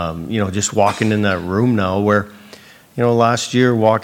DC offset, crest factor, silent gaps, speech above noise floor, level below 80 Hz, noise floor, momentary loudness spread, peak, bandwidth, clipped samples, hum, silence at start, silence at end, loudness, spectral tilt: under 0.1%; 14 dB; none; 27 dB; -48 dBFS; -42 dBFS; 7 LU; -2 dBFS; 16.5 kHz; under 0.1%; none; 0 s; 0 s; -16 LUFS; -5.5 dB/octave